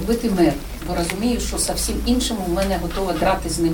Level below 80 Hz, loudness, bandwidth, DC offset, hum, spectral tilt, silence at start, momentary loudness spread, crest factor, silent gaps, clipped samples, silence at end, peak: -30 dBFS; -21 LUFS; 20 kHz; 0.1%; none; -4.5 dB/octave; 0 s; 5 LU; 16 dB; none; under 0.1%; 0 s; -6 dBFS